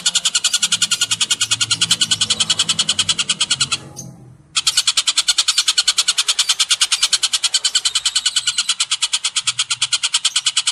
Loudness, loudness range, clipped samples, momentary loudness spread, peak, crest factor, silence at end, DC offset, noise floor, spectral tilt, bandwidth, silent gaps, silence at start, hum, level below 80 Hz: -15 LUFS; 2 LU; under 0.1%; 3 LU; -2 dBFS; 16 dB; 0 s; under 0.1%; -40 dBFS; 2 dB/octave; 15.5 kHz; none; 0 s; none; -58 dBFS